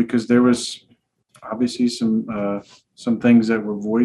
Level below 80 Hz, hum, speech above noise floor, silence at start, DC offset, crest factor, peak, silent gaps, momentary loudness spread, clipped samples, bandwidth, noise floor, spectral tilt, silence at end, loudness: -60 dBFS; none; 38 dB; 0 s; under 0.1%; 16 dB; -4 dBFS; none; 14 LU; under 0.1%; 11.5 kHz; -57 dBFS; -5.5 dB/octave; 0 s; -19 LUFS